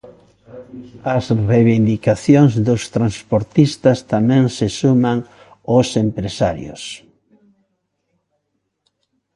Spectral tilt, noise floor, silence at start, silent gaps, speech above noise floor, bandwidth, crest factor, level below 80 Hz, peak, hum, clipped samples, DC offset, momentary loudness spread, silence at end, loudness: -7 dB/octave; -72 dBFS; 0.05 s; none; 56 dB; 11.5 kHz; 16 dB; -46 dBFS; 0 dBFS; none; under 0.1%; under 0.1%; 17 LU; 2.4 s; -16 LUFS